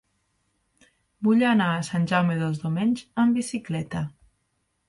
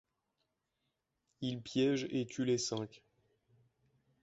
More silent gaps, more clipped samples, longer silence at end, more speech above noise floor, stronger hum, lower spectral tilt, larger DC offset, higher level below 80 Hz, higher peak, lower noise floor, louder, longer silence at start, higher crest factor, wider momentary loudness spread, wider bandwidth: neither; neither; second, 0.8 s vs 1.25 s; about the same, 50 dB vs 50 dB; neither; about the same, -6.5 dB/octave vs -5.5 dB/octave; neither; first, -60 dBFS vs -76 dBFS; first, -10 dBFS vs -22 dBFS; second, -74 dBFS vs -85 dBFS; first, -24 LUFS vs -36 LUFS; second, 1.2 s vs 1.4 s; about the same, 16 dB vs 18 dB; about the same, 10 LU vs 9 LU; first, 11.5 kHz vs 8 kHz